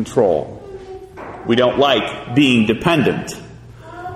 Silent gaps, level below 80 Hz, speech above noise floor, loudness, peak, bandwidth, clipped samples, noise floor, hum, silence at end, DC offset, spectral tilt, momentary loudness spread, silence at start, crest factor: none; -46 dBFS; 21 dB; -16 LUFS; -2 dBFS; 13.5 kHz; under 0.1%; -37 dBFS; none; 0 s; under 0.1%; -5.5 dB/octave; 20 LU; 0 s; 16 dB